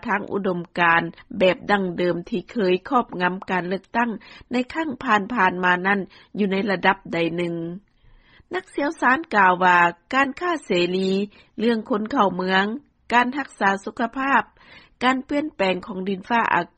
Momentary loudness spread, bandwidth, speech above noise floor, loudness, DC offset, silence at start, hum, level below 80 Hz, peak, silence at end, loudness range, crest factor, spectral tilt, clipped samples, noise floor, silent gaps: 9 LU; 9.2 kHz; 31 dB; -22 LUFS; under 0.1%; 0.05 s; none; -58 dBFS; -4 dBFS; 0.1 s; 4 LU; 18 dB; -6 dB/octave; under 0.1%; -53 dBFS; none